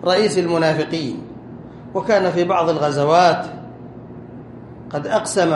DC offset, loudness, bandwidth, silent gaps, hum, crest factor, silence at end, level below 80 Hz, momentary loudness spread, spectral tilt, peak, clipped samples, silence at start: under 0.1%; -18 LUFS; 11.5 kHz; none; none; 18 dB; 0 s; -54 dBFS; 22 LU; -5 dB/octave; 0 dBFS; under 0.1%; 0 s